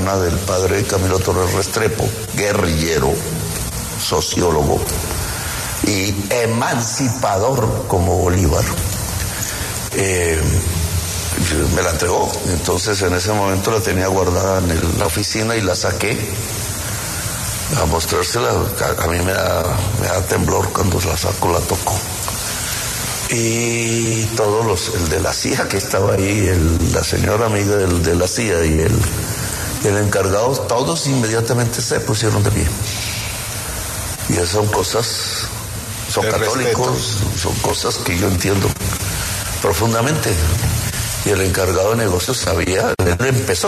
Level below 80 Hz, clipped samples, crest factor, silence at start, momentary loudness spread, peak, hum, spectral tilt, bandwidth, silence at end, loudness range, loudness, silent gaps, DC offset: -30 dBFS; under 0.1%; 14 dB; 0 s; 5 LU; -2 dBFS; none; -4 dB/octave; 14 kHz; 0 s; 2 LU; -17 LUFS; none; under 0.1%